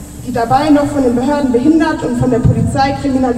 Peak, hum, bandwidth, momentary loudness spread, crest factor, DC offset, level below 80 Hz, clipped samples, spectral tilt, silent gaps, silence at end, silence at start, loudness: -2 dBFS; none; 14 kHz; 4 LU; 12 dB; under 0.1%; -30 dBFS; under 0.1%; -7 dB/octave; none; 0 s; 0 s; -13 LUFS